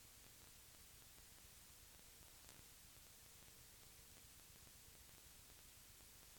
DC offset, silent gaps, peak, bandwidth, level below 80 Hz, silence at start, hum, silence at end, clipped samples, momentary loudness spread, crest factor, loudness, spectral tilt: under 0.1%; none; -36 dBFS; 19 kHz; -74 dBFS; 0 s; none; 0 s; under 0.1%; 1 LU; 28 dB; -62 LUFS; -1.5 dB/octave